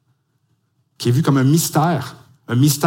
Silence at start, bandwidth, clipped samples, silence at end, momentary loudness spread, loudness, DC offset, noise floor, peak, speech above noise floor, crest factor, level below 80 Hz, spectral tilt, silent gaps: 1 s; 17 kHz; under 0.1%; 0 s; 9 LU; -17 LUFS; under 0.1%; -65 dBFS; -2 dBFS; 50 dB; 16 dB; -60 dBFS; -5.5 dB/octave; none